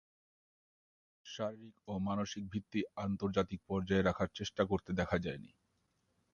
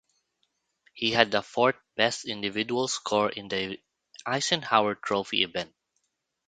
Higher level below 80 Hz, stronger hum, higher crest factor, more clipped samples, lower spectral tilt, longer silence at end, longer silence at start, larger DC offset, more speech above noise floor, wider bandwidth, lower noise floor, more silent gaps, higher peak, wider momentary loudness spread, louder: first, -58 dBFS vs -68 dBFS; neither; second, 22 dB vs 28 dB; neither; first, -6 dB/octave vs -3 dB/octave; about the same, 0.85 s vs 0.8 s; first, 1.25 s vs 0.95 s; neither; second, 42 dB vs 52 dB; second, 7.2 kHz vs 9.4 kHz; about the same, -79 dBFS vs -79 dBFS; neither; second, -18 dBFS vs 0 dBFS; about the same, 10 LU vs 9 LU; second, -37 LUFS vs -27 LUFS